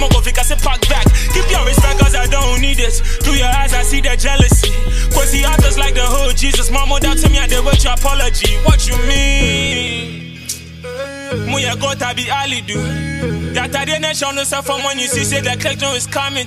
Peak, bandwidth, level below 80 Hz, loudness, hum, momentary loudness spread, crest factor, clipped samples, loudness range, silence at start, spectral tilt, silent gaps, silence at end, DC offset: 0 dBFS; 15.5 kHz; -14 dBFS; -15 LUFS; none; 7 LU; 12 dB; under 0.1%; 4 LU; 0 s; -3.5 dB/octave; none; 0 s; under 0.1%